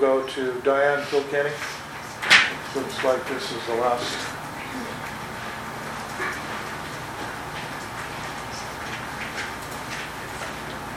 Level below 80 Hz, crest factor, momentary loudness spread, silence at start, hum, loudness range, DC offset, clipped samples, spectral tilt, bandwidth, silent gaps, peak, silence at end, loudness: -52 dBFS; 26 dB; 11 LU; 0 s; none; 10 LU; under 0.1%; under 0.1%; -3 dB/octave; 17 kHz; none; 0 dBFS; 0 s; -26 LUFS